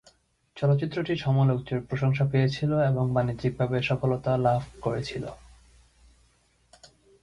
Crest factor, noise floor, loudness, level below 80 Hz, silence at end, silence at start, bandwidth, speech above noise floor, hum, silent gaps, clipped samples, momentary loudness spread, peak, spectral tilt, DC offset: 18 dB; -65 dBFS; -26 LUFS; -54 dBFS; 0.35 s; 0.55 s; 10 kHz; 40 dB; none; none; under 0.1%; 7 LU; -10 dBFS; -8 dB/octave; under 0.1%